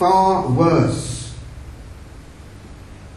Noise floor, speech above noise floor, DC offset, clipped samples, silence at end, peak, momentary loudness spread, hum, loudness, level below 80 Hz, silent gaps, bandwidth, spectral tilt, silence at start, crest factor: -39 dBFS; 23 dB; under 0.1%; under 0.1%; 0 s; -2 dBFS; 25 LU; none; -17 LUFS; -38 dBFS; none; 12 kHz; -6.5 dB/octave; 0 s; 18 dB